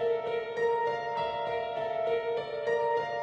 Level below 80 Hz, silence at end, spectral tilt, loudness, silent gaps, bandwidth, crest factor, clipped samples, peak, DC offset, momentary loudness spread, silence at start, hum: -66 dBFS; 0 s; -4.5 dB/octave; -31 LUFS; none; 7.2 kHz; 12 dB; under 0.1%; -18 dBFS; under 0.1%; 4 LU; 0 s; none